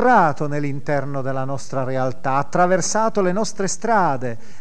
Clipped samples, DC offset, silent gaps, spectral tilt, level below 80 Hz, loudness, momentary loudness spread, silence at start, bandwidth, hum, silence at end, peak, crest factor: under 0.1%; 6%; none; -5 dB/octave; -58 dBFS; -21 LUFS; 8 LU; 0 s; 11 kHz; none; 0.25 s; -4 dBFS; 16 dB